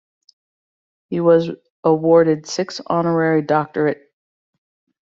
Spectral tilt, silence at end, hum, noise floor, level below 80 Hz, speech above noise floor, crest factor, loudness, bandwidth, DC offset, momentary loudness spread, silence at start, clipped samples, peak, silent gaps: -6 dB/octave; 1.1 s; none; under -90 dBFS; -62 dBFS; over 73 dB; 16 dB; -18 LUFS; 7.6 kHz; under 0.1%; 11 LU; 1.1 s; under 0.1%; -2 dBFS; 1.70-1.83 s